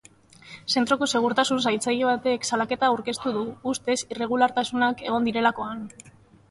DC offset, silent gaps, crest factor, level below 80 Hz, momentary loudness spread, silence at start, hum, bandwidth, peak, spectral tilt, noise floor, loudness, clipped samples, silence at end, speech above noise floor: under 0.1%; none; 18 dB; -62 dBFS; 8 LU; 0.45 s; none; 11.5 kHz; -6 dBFS; -3 dB/octave; -50 dBFS; -24 LUFS; under 0.1%; 0.4 s; 26 dB